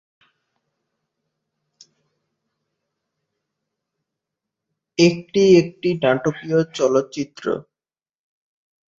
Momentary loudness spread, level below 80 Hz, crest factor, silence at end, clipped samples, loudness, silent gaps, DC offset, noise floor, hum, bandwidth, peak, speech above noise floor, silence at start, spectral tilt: 13 LU; -64 dBFS; 22 dB; 1.35 s; under 0.1%; -19 LUFS; none; under 0.1%; under -90 dBFS; none; 7.6 kHz; -2 dBFS; over 72 dB; 5 s; -6 dB/octave